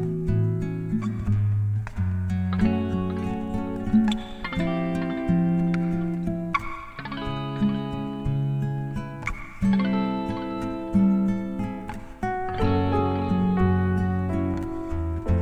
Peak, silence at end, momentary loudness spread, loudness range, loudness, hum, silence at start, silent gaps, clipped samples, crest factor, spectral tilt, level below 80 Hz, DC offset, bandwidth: -8 dBFS; 0 s; 9 LU; 3 LU; -26 LUFS; none; 0 s; none; under 0.1%; 16 dB; -8.5 dB/octave; -40 dBFS; under 0.1%; 9.4 kHz